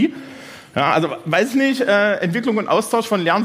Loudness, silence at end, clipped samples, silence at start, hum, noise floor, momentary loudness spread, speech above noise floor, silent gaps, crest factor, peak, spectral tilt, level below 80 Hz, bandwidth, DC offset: -18 LUFS; 0 s; under 0.1%; 0 s; none; -38 dBFS; 11 LU; 20 dB; none; 16 dB; -2 dBFS; -5 dB/octave; -64 dBFS; 16 kHz; under 0.1%